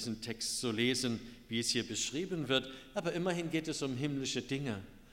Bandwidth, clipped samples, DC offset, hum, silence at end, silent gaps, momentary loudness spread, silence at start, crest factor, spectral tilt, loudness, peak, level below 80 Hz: 16 kHz; under 0.1%; under 0.1%; none; 0.05 s; none; 7 LU; 0 s; 20 dB; -3.5 dB/octave; -36 LUFS; -16 dBFS; -62 dBFS